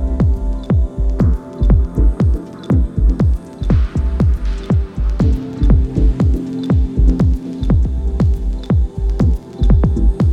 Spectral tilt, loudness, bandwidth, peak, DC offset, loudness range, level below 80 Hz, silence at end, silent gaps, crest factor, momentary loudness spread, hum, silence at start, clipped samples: -9.5 dB/octave; -17 LUFS; 5.4 kHz; 0 dBFS; 0.1%; 1 LU; -16 dBFS; 0 s; none; 14 dB; 5 LU; none; 0 s; under 0.1%